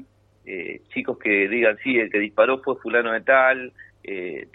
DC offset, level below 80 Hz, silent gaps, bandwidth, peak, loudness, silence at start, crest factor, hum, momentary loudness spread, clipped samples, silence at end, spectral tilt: under 0.1%; -66 dBFS; none; 4.1 kHz; -4 dBFS; -21 LUFS; 0 s; 20 dB; none; 16 LU; under 0.1%; 0.1 s; -8 dB/octave